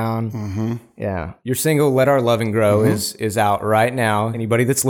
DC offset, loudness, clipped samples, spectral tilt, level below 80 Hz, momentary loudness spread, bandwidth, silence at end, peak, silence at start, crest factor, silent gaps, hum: under 0.1%; -19 LUFS; under 0.1%; -5.5 dB/octave; -50 dBFS; 10 LU; over 20 kHz; 0 s; -4 dBFS; 0 s; 14 dB; none; none